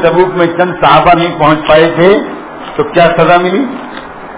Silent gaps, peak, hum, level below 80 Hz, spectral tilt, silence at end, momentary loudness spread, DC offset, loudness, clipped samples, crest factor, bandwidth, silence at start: none; 0 dBFS; none; -38 dBFS; -9.5 dB/octave; 0 s; 16 LU; under 0.1%; -8 LUFS; 3%; 8 dB; 4 kHz; 0 s